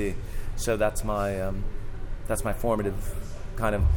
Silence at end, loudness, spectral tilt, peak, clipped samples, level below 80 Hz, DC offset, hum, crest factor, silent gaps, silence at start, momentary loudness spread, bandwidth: 0 s; -30 LUFS; -6 dB/octave; -12 dBFS; under 0.1%; -30 dBFS; under 0.1%; none; 16 dB; none; 0 s; 13 LU; 17.5 kHz